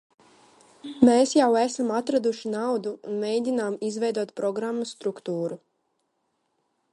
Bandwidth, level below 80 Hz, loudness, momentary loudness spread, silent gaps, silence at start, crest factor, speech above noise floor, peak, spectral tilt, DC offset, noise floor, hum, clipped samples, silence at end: 11.5 kHz; -68 dBFS; -25 LUFS; 12 LU; none; 0.85 s; 22 dB; 50 dB; -4 dBFS; -5 dB/octave; under 0.1%; -74 dBFS; none; under 0.1%; 1.35 s